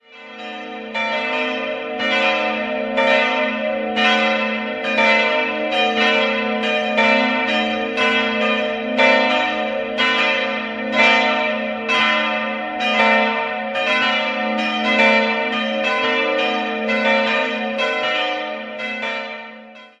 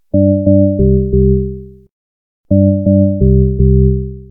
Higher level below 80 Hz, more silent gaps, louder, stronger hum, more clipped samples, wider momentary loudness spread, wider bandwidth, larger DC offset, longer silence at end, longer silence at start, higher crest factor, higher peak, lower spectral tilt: second, -60 dBFS vs -18 dBFS; second, none vs 1.91-2.44 s; second, -17 LUFS vs -12 LUFS; neither; neither; first, 9 LU vs 6 LU; first, 9.6 kHz vs 0.8 kHz; neither; about the same, 0.15 s vs 0.1 s; about the same, 0.1 s vs 0.15 s; first, 18 dB vs 10 dB; about the same, 0 dBFS vs 0 dBFS; second, -3.5 dB/octave vs -18 dB/octave